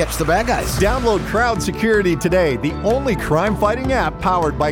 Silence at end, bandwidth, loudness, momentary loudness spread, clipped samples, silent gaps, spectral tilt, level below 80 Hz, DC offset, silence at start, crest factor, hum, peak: 0 s; 19.5 kHz; -18 LUFS; 3 LU; under 0.1%; none; -5.5 dB/octave; -30 dBFS; under 0.1%; 0 s; 12 dB; none; -4 dBFS